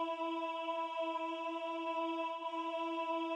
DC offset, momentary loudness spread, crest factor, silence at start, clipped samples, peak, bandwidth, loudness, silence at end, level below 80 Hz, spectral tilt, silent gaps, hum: under 0.1%; 2 LU; 10 dB; 0 s; under 0.1%; -28 dBFS; 9.4 kHz; -39 LUFS; 0 s; under -90 dBFS; -2 dB/octave; none; none